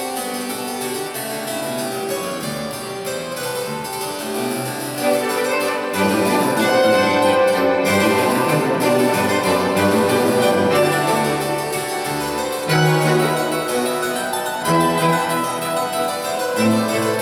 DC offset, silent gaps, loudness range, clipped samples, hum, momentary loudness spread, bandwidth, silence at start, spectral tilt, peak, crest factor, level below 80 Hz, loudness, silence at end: under 0.1%; none; 8 LU; under 0.1%; none; 9 LU; 19.5 kHz; 0 s; -4.5 dB/octave; -4 dBFS; 14 dB; -56 dBFS; -19 LUFS; 0 s